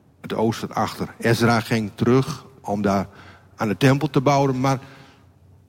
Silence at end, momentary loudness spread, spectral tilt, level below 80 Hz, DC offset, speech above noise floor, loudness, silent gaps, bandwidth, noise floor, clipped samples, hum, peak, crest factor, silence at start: 0.75 s; 10 LU; -6.5 dB/octave; -54 dBFS; under 0.1%; 31 dB; -21 LUFS; none; 16.5 kHz; -52 dBFS; under 0.1%; none; -4 dBFS; 18 dB; 0.25 s